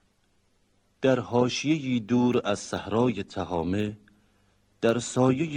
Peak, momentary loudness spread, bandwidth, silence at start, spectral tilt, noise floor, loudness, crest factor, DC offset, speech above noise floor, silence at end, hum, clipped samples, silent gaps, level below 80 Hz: -8 dBFS; 7 LU; 10.5 kHz; 1 s; -6 dB/octave; -67 dBFS; -26 LUFS; 18 dB; under 0.1%; 42 dB; 0 s; none; under 0.1%; none; -60 dBFS